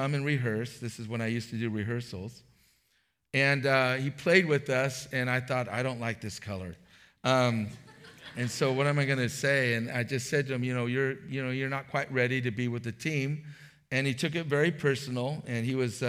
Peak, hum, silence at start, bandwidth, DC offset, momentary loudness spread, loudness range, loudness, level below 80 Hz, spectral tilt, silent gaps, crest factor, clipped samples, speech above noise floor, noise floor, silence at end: -8 dBFS; none; 0 s; 15.5 kHz; under 0.1%; 12 LU; 4 LU; -30 LUFS; -70 dBFS; -5.5 dB/octave; none; 22 dB; under 0.1%; 44 dB; -74 dBFS; 0 s